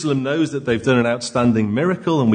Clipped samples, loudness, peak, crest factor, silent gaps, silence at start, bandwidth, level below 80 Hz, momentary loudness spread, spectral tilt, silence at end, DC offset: under 0.1%; -19 LUFS; -4 dBFS; 14 dB; none; 0 s; 9.6 kHz; -52 dBFS; 3 LU; -6.5 dB/octave; 0 s; under 0.1%